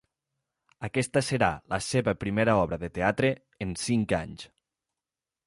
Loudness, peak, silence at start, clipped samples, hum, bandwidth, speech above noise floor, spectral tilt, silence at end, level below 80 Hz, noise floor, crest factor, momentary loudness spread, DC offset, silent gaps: -28 LUFS; -8 dBFS; 0.8 s; under 0.1%; none; 11.5 kHz; over 63 dB; -5.5 dB/octave; 1 s; -52 dBFS; under -90 dBFS; 20 dB; 12 LU; under 0.1%; none